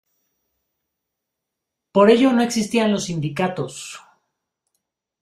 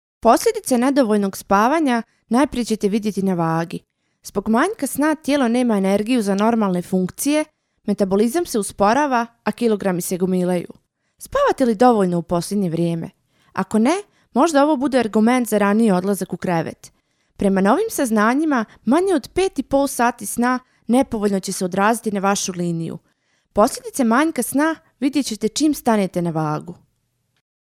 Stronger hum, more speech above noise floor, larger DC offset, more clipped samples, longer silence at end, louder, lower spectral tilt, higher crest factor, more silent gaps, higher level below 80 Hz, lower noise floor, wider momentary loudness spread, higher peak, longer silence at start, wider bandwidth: neither; first, 64 dB vs 50 dB; neither; neither; first, 1.25 s vs 0.9 s; about the same, -18 LUFS vs -19 LUFS; about the same, -5 dB/octave vs -5.5 dB/octave; about the same, 20 dB vs 18 dB; neither; second, -60 dBFS vs -50 dBFS; first, -82 dBFS vs -69 dBFS; first, 16 LU vs 9 LU; about the same, -2 dBFS vs 0 dBFS; first, 1.95 s vs 0.25 s; second, 14 kHz vs 16 kHz